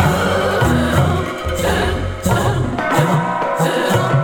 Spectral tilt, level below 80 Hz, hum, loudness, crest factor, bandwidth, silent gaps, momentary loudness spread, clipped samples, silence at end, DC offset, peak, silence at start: -5.5 dB/octave; -30 dBFS; none; -17 LUFS; 16 dB; 19 kHz; none; 5 LU; under 0.1%; 0 s; under 0.1%; 0 dBFS; 0 s